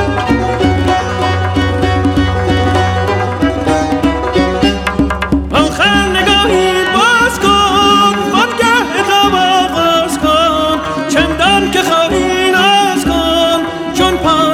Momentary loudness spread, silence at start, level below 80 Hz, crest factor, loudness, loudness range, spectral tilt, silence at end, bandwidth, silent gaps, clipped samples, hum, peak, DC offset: 5 LU; 0 s; -26 dBFS; 10 dB; -11 LUFS; 3 LU; -4.5 dB/octave; 0 s; 16.5 kHz; none; under 0.1%; none; -2 dBFS; under 0.1%